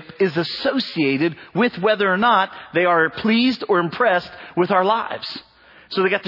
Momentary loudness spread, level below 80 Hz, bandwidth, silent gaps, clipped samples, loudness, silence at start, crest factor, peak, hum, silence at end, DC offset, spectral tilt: 8 LU; -62 dBFS; 6 kHz; none; under 0.1%; -19 LUFS; 0 s; 16 dB; -4 dBFS; none; 0 s; under 0.1%; -7 dB/octave